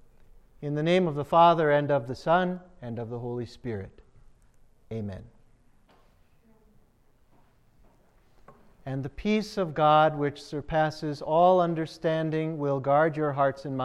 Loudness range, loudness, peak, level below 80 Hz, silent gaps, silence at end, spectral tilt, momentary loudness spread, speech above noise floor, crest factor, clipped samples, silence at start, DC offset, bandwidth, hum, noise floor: 20 LU; -26 LUFS; -8 dBFS; -56 dBFS; none; 0 s; -7 dB/octave; 17 LU; 36 dB; 20 dB; under 0.1%; 0.6 s; under 0.1%; 12 kHz; none; -61 dBFS